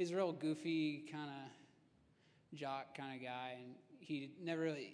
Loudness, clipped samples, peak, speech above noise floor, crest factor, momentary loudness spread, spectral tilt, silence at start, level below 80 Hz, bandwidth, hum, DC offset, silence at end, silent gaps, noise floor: -44 LUFS; under 0.1%; -26 dBFS; 29 dB; 18 dB; 15 LU; -6 dB/octave; 0 s; under -90 dBFS; 10.5 kHz; none; under 0.1%; 0 s; none; -72 dBFS